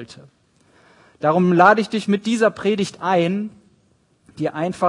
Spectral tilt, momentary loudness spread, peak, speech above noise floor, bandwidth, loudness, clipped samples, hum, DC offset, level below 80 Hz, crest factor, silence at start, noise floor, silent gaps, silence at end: -6 dB/octave; 14 LU; 0 dBFS; 42 dB; 11 kHz; -18 LUFS; under 0.1%; none; under 0.1%; -64 dBFS; 20 dB; 0 s; -60 dBFS; none; 0 s